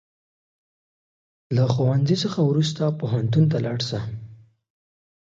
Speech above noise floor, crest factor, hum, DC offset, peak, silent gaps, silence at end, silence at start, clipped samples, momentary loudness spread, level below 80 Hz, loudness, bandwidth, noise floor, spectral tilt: 23 dB; 18 dB; none; under 0.1%; -6 dBFS; none; 0.95 s; 1.5 s; under 0.1%; 8 LU; -58 dBFS; -22 LUFS; 7.8 kHz; -44 dBFS; -7 dB/octave